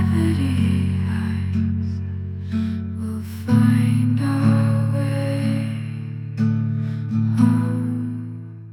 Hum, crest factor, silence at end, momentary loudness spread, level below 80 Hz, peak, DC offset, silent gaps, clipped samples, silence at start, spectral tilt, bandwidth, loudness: none; 16 dB; 0 s; 11 LU; -48 dBFS; -4 dBFS; under 0.1%; none; under 0.1%; 0 s; -8.5 dB/octave; 12 kHz; -21 LUFS